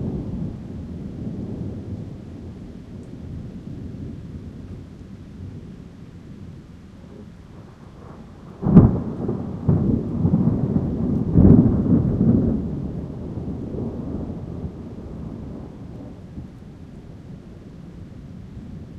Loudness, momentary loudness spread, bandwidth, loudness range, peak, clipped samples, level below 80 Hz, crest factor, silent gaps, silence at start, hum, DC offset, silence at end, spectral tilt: -21 LUFS; 23 LU; 5.8 kHz; 20 LU; 0 dBFS; under 0.1%; -36 dBFS; 24 dB; none; 0 s; none; under 0.1%; 0 s; -11.5 dB/octave